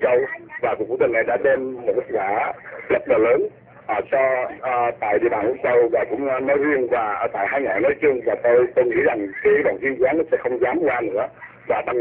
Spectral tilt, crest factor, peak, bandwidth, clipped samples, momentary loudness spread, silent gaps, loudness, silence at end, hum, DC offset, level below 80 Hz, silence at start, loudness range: -9.5 dB/octave; 14 dB; -6 dBFS; 4 kHz; under 0.1%; 7 LU; none; -20 LUFS; 0 s; none; under 0.1%; -56 dBFS; 0 s; 2 LU